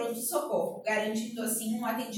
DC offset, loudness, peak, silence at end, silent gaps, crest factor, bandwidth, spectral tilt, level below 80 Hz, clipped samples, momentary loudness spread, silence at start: under 0.1%; -31 LUFS; -16 dBFS; 0 s; none; 16 dB; 17 kHz; -3 dB/octave; -82 dBFS; under 0.1%; 3 LU; 0 s